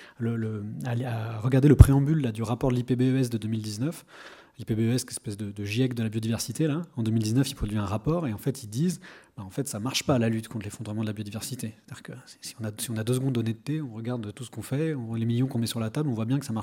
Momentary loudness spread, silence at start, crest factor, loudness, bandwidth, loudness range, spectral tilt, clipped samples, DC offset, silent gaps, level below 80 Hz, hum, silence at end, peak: 13 LU; 0 s; 26 dB; -27 LUFS; 17 kHz; 9 LU; -6.5 dB/octave; under 0.1%; under 0.1%; none; -38 dBFS; none; 0 s; 0 dBFS